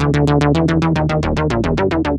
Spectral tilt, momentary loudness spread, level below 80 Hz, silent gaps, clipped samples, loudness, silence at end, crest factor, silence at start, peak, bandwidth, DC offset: -7.5 dB/octave; 3 LU; -28 dBFS; none; under 0.1%; -16 LUFS; 0 s; 12 dB; 0 s; -2 dBFS; 9.8 kHz; under 0.1%